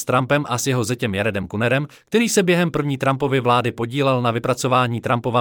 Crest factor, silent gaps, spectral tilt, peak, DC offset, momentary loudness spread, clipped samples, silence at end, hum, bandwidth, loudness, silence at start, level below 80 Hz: 14 dB; none; -5 dB/octave; -4 dBFS; under 0.1%; 5 LU; under 0.1%; 0 s; none; 18.5 kHz; -20 LUFS; 0 s; -54 dBFS